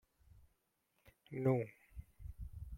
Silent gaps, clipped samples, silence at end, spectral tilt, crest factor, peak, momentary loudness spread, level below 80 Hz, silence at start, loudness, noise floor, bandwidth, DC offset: none; under 0.1%; 0 s; -10 dB/octave; 24 dB; -20 dBFS; 21 LU; -56 dBFS; 0.4 s; -40 LUFS; -82 dBFS; 14.5 kHz; under 0.1%